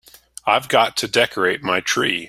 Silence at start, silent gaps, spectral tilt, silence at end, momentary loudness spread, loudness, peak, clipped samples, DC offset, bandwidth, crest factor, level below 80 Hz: 0.45 s; none; -2.5 dB/octave; 0 s; 4 LU; -18 LUFS; 0 dBFS; under 0.1%; under 0.1%; 16 kHz; 20 dB; -58 dBFS